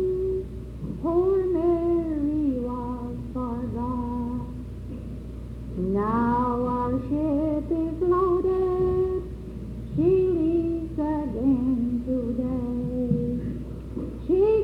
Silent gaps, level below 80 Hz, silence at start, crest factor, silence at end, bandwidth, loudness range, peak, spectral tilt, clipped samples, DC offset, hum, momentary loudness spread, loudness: none; -38 dBFS; 0 s; 14 dB; 0 s; 5.4 kHz; 5 LU; -12 dBFS; -10.5 dB/octave; under 0.1%; under 0.1%; none; 14 LU; -26 LUFS